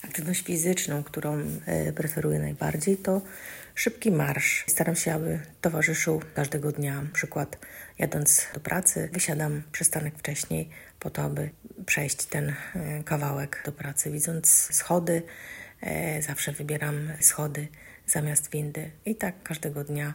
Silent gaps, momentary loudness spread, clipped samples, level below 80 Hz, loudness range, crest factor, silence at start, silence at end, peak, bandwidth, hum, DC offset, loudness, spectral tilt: none; 13 LU; under 0.1%; -58 dBFS; 4 LU; 26 dB; 0 s; 0 s; -2 dBFS; 16.5 kHz; none; under 0.1%; -26 LUFS; -4 dB/octave